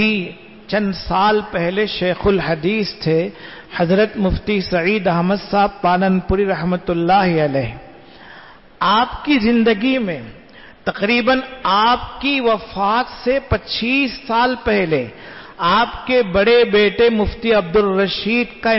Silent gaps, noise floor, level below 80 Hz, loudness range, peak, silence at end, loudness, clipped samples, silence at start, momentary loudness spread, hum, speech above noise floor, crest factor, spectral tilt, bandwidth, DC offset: none; -41 dBFS; -38 dBFS; 3 LU; -4 dBFS; 0 s; -17 LUFS; under 0.1%; 0 s; 7 LU; none; 25 dB; 12 dB; -9 dB/octave; 6 kHz; 0.3%